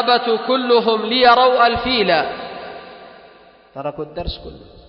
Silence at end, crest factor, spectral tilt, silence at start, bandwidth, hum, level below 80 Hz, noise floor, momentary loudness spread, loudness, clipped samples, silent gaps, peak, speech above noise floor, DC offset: 0.25 s; 18 dB; -6.5 dB/octave; 0 s; 6 kHz; none; -42 dBFS; -46 dBFS; 21 LU; -15 LUFS; under 0.1%; none; 0 dBFS; 30 dB; under 0.1%